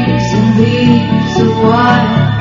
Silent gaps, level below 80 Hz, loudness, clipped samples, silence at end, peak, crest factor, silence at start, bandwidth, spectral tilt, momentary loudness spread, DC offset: none; -34 dBFS; -10 LUFS; under 0.1%; 0 s; 0 dBFS; 10 dB; 0 s; 7.6 kHz; -6 dB/octave; 3 LU; under 0.1%